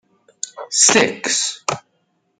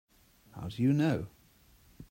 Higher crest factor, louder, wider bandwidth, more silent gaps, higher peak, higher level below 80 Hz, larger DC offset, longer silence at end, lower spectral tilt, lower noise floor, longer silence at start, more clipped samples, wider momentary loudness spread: about the same, 20 dB vs 16 dB; first, -15 LUFS vs -31 LUFS; second, 11 kHz vs 16 kHz; neither; first, 0 dBFS vs -18 dBFS; about the same, -64 dBFS vs -60 dBFS; neither; first, 0.6 s vs 0.1 s; second, -1 dB/octave vs -8 dB/octave; about the same, -66 dBFS vs -63 dBFS; about the same, 0.45 s vs 0.55 s; neither; about the same, 19 LU vs 20 LU